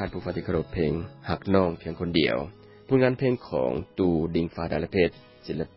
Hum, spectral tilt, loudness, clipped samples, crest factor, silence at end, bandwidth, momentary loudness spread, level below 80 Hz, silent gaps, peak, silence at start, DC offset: none; -11 dB/octave; -27 LUFS; under 0.1%; 18 dB; 0.1 s; 5.8 kHz; 9 LU; -46 dBFS; none; -8 dBFS; 0 s; under 0.1%